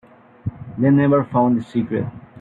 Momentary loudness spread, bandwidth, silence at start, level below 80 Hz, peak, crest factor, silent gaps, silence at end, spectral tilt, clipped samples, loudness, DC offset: 16 LU; 4.6 kHz; 0.45 s; -52 dBFS; -4 dBFS; 14 dB; none; 0 s; -10.5 dB/octave; under 0.1%; -18 LUFS; under 0.1%